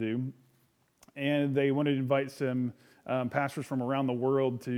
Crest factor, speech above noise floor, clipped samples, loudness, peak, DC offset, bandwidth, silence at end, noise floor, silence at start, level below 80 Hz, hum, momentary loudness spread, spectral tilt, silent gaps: 20 dB; 40 dB; under 0.1%; -31 LUFS; -12 dBFS; under 0.1%; 15.5 kHz; 0 s; -69 dBFS; 0 s; -78 dBFS; none; 8 LU; -7.5 dB/octave; none